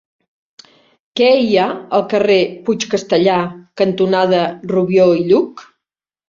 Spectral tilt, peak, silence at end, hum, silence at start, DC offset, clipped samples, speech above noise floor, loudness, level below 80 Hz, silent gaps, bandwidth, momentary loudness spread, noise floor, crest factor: -5.5 dB/octave; -2 dBFS; 0.65 s; none; 1.15 s; under 0.1%; under 0.1%; 70 dB; -15 LUFS; -58 dBFS; none; 7.4 kHz; 7 LU; -84 dBFS; 14 dB